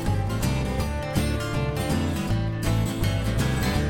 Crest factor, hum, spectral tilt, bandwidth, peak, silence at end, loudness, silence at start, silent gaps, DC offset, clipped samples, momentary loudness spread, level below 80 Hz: 14 dB; none; -6 dB/octave; 17.5 kHz; -10 dBFS; 0 s; -26 LUFS; 0 s; none; under 0.1%; under 0.1%; 2 LU; -32 dBFS